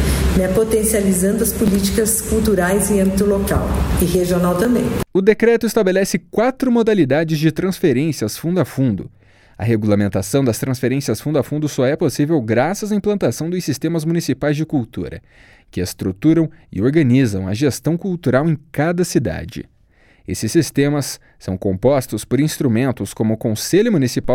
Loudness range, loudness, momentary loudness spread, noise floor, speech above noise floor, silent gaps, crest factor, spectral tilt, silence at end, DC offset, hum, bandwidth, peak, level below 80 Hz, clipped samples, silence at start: 4 LU; -17 LUFS; 7 LU; -52 dBFS; 35 dB; none; 16 dB; -6 dB/octave; 0 s; under 0.1%; none; 17.5 kHz; 0 dBFS; -32 dBFS; under 0.1%; 0 s